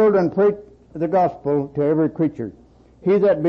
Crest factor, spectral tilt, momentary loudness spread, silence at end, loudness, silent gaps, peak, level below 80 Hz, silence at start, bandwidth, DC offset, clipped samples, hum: 10 dB; -10 dB/octave; 16 LU; 0 s; -20 LUFS; none; -10 dBFS; -54 dBFS; 0 s; 6 kHz; under 0.1%; under 0.1%; none